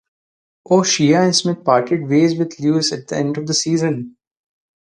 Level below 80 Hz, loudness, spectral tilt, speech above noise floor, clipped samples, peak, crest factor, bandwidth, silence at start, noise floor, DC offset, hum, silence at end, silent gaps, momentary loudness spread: -62 dBFS; -17 LUFS; -4.5 dB/octave; over 74 dB; under 0.1%; 0 dBFS; 18 dB; 10 kHz; 0.7 s; under -90 dBFS; under 0.1%; none; 0.75 s; none; 8 LU